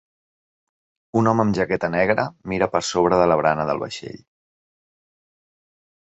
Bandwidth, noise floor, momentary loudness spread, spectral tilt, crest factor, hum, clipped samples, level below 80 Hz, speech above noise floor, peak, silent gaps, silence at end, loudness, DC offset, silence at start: 8.2 kHz; under -90 dBFS; 9 LU; -5.5 dB/octave; 20 dB; none; under 0.1%; -52 dBFS; over 70 dB; -2 dBFS; none; 1.85 s; -20 LUFS; under 0.1%; 1.15 s